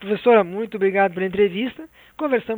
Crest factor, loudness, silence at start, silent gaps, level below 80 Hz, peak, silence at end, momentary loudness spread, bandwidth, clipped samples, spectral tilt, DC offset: 18 dB; -20 LUFS; 0 s; none; -58 dBFS; -2 dBFS; 0 s; 11 LU; over 20 kHz; under 0.1%; -8 dB/octave; under 0.1%